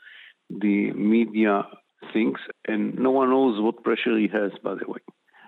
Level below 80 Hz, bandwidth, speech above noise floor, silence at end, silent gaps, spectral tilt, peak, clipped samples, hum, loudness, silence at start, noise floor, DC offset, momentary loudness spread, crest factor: -76 dBFS; 4.2 kHz; 26 dB; 0.5 s; none; -9 dB/octave; -10 dBFS; under 0.1%; none; -24 LUFS; 0.15 s; -49 dBFS; under 0.1%; 13 LU; 14 dB